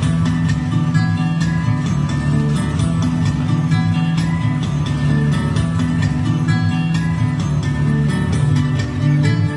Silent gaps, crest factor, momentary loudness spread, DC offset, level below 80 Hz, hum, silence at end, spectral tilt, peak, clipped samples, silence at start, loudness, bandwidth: none; 12 dB; 2 LU; under 0.1%; -34 dBFS; none; 0 s; -7 dB/octave; -4 dBFS; under 0.1%; 0 s; -17 LUFS; 11 kHz